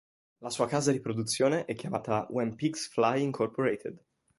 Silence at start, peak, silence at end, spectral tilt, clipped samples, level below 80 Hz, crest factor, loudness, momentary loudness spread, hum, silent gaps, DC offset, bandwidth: 0.4 s; -12 dBFS; 0.4 s; -5 dB/octave; under 0.1%; -68 dBFS; 18 dB; -30 LUFS; 8 LU; none; none; under 0.1%; 12 kHz